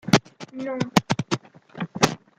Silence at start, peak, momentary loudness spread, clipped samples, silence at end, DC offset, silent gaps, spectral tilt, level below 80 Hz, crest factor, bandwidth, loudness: 0.05 s; -2 dBFS; 13 LU; under 0.1%; 0.2 s; under 0.1%; none; -4.5 dB/octave; -54 dBFS; 24 dB; 16 kHz; -25 LUFS